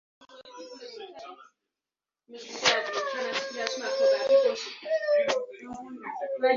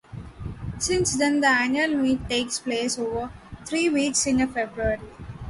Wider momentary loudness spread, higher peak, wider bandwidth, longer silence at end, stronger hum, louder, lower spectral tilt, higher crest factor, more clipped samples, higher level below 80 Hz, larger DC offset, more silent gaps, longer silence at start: first, 21 LU vs 17 LU; about the same, -8 dBFS vs -8 dBFS; second, 7.6 kHz vs 11.5 kHz; about the same, 0 s vs 0 s; neither; second, -27 LUFS vs -23 LUFS; second, -1 dB/octave vs -3.5 dB/octave; first, 22 dB vs 16 dB; neither; second, -76 dBFS vs -44 dBFS; neither; neither; about the same, 0.2 s vs 0.1 s